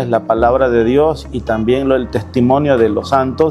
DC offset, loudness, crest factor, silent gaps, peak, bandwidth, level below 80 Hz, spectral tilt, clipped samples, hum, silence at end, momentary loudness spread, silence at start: under 0.1%; -14 LUFS; 14 dB; none; 0 dBFS; 12 kHz; -34 dBFS; -7.5 dB/octave; under 0.1%; none; 0 s; 5 LU; 0 s